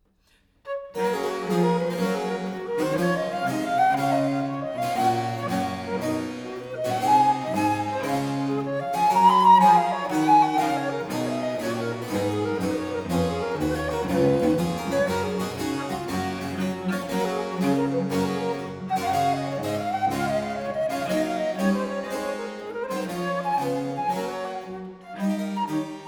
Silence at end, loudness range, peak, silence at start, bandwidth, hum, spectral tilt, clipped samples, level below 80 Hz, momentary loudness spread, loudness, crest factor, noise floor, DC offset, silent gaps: 0 s; 7 LU; -6 dBFS; 0.65 s; over 20 kHz; none; -6 dB/octave; under 0.1%; -54 dBFS; 10 LU; -25 LUFS; 18 dB; -63 dBFS; under 0.1%; none